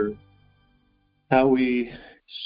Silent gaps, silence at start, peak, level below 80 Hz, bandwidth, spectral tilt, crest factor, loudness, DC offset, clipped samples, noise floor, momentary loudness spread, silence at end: none; 0 s; -4 dBFS; -54 dBFS; 5.2 kHz; -4.5 dB/octave; 22 dB; -23 LUFS; under 0.1%; under 0.1%; -66 dBFS; 24 LU; 0 s